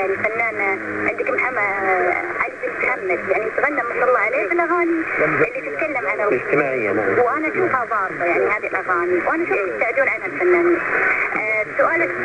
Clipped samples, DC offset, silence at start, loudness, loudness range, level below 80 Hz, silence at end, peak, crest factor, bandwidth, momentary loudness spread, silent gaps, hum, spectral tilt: under 0.1%; under 0.1%; 0 s; -19 LUFS; 2 LU; -56 dBFS; 0 s; -4 dBFS; 16 dB; 9.8 kHz; 4 LU; none; none; -7 dB/octave